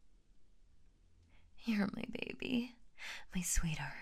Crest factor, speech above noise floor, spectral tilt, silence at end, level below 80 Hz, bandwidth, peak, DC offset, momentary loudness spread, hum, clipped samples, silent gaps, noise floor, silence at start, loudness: 20 dB; 27 dB; -4 dB/octave; 0 s; -48 dBFS; 15.5 kHz; -22 dBFS; under 0.1%; 11 LU; none; under 0.1%; none; -65 dBFS; 0 s; -40 LUFS